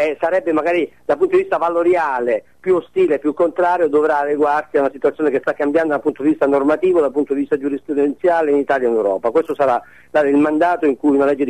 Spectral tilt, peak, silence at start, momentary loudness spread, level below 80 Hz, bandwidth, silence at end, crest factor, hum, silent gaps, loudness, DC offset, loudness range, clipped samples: -7 dB/octave; -6 dBFS; 0 s; 4 LU; -60 dBFS; 9.6 kHz; 0 s; 10 dB; none; none; -17 LUFS; 0.3%; 1 LU; under 0.1%